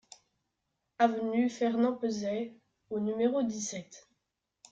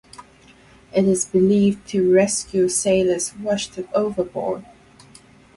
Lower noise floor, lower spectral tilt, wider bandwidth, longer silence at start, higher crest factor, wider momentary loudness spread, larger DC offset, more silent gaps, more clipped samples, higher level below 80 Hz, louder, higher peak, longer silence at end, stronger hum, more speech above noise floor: first, -84 dBFS vs -50 dBFS; about the same, -5 dB/octave vs -5 dB/octave; second, 8.8 kHz vs 11.5 kHz; first, 1 s vs 0.2 s; about the same, 20 dB vs 16 dB; first, 11 LU vs 8 LU; neither; neither; neither; second, -76 dBFS vs -54 dBFS; second, -31 LUFS vs -20 LUFS; second, -12 dBFS vs -4 dBFS; second, 0.7 s vs 0.95 s; neither; first, 54 dB vs 31 dB